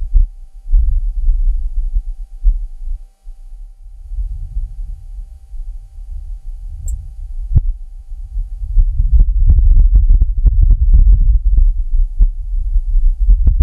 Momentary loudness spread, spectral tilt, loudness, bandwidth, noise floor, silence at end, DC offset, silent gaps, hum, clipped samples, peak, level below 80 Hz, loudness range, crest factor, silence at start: 20 LU; -9.5 dB/octave; -18 LUFS; 0.6 kHz; -32 dBFS; 0 s; under 0.1%; none; none; under 0.1%; -2 dBFS; -12 dBFS; 17 LU; 12 dB; 0 s